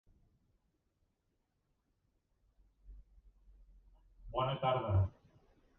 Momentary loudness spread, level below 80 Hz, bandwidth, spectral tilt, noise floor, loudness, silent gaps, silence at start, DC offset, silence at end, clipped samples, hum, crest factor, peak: 7 LU; -54 dBFS; 3.8 kHz; -6 dB/octave; -82 dBFS; -36 LUFS; none; 2.85 s; under 0.1%; 0.7 s; under 0.1%; none; 20 dB; -22 dBFS